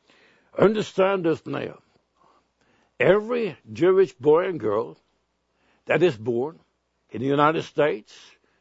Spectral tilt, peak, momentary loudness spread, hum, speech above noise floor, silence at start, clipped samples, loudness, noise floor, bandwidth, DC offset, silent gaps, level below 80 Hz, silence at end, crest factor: -7 dB/octave; -2 dBFS; 13 LU; none; 49 dB; 0.55 s; under 0.1%; -23 LUFS; -71 dBFS; 8 kHz; under 0.1%; none; -66 dBFS; 0.6 s; 22 dB